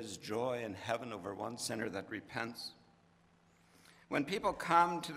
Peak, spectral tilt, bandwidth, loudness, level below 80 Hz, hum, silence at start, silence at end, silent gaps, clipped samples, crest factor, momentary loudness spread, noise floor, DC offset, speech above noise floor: -14 dBFS; -4 dB/octave; 16 kHz; -37 LUFS; -72 dBFS; none; 0 s; 0 s; none; under 0.1%; 24 dB; 13 LU; -68 dBFS; under 0.1%; 31 dB